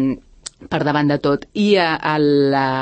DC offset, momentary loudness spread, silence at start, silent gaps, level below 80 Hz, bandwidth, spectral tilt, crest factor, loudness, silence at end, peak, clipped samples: under 0.1%; 13 LU; 0 s; none; -50 dBFS; 8.8 kHz; -6 dB/octave; 14 dB; -17 LUFS; 0 s; -4 dBFS; under 0.1%